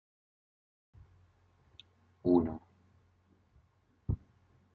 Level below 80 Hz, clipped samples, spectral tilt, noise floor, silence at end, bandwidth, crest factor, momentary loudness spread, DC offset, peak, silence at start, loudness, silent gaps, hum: -56 dBFS; under 0.1%; -11 dB/octave; -70 dBFS; 0.6 s; 4.6 kHz; 24 dB; 17 LU; under 0.1%; -14 dBFS; 2.25 s; -34 LUFS; none; none